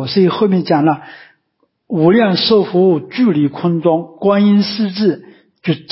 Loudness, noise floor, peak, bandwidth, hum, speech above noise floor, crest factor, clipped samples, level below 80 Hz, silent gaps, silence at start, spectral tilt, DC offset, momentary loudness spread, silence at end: -14 LUFS; -64 dBFS; -2 dBFS; 5.8 kHz; none; 52 dB; 12 dB; under 0.1%; -58 dBFS; none; 0 s; -10.5 dB/octave; under 0.1%; 9 LU; 0.15 s